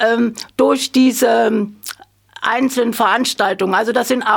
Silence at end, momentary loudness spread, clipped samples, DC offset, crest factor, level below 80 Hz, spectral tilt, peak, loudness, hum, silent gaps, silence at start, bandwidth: 0 s; 10 LU; under 0.1%; under 0.1%; 14 dB; -62 dBFS; -3.5 dB/octave; -2 dBFS; -16 LUFS; none; none; 0 s; 19.5 kHz